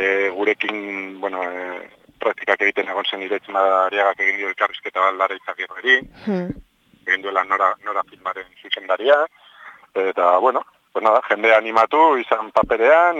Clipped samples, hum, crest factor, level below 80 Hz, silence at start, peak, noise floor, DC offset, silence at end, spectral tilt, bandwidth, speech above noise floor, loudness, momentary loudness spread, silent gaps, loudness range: under 0.1%; none; 18 dB; -56 dBFS; 0 s; -2 dBFS; -44 dBFS; under 0.1%; 0 s; -5 dB/octave; 7.8 kHz; 25 dB; -19 LUFS; 13 LU; none; 4 LU